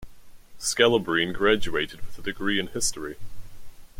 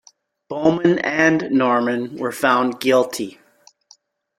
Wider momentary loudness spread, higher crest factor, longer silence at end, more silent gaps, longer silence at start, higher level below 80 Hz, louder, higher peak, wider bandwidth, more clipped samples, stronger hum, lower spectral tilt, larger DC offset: first, 16 LU vs 10 LU; about the same, 20 dB vs 18 dB; second, 0 s vs 1.1 s; neither; second, 0 s vs 0.5 s; first, -44 dBFS vs -62 dBFS; second, -25 LUFS vs -18 LUFS; about the same, -4 dBFS vs -2 dBFS; about the same, 16.5 kHz vs 16.5 kHz; neither; neither; second, -3 dB/octave vs -5 dB/octave; neither